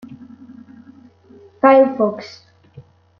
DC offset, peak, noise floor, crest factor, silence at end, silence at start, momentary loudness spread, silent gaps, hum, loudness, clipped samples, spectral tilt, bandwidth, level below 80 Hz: under 0.1%; -2 dBFS; -47 dBFS; 18 dB; 0.4 s; 0.1 s; 26 LU; none; none; -14 LUFS; under 0.1%; -7 dB/octave; 6.4 kHz; -68 dBFS